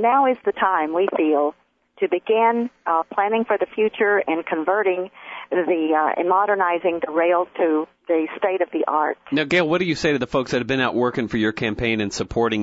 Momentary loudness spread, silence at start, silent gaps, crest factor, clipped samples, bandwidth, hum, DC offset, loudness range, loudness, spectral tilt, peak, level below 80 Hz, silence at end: 5 LU; 0 s; none; 14 dB; under 0.1%; 8 kHz; none; under 0.1%; 1 LU; -21 LUFS; -5.5 dB/octave; -6 dBFS; -50 dBFS; 0 s